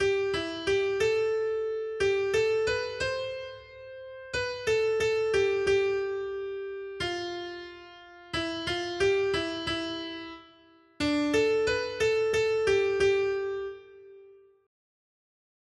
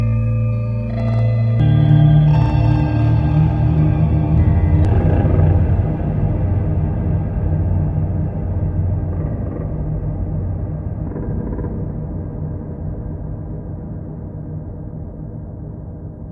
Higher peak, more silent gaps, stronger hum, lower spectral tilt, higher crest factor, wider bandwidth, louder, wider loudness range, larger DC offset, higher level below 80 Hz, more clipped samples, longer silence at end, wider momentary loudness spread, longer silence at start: second, -14 dBFS vs -2 dBFS; neither; neither; second, -4 dB/octave vs -11 dB/octave; about the same, 16 dB vs 14 dB; first, 11.5 kHz vs 4.7 kHz; second, -28 LUFS vs -18 LUFS; second, 4 LU vs 13 LU; neither; second, -56 dBFS vs -26 dBFS; neither; first, 1.35 s vs 0 s; about the same, 16 LU vs 15 LU; about the same, 0 s vs 0 s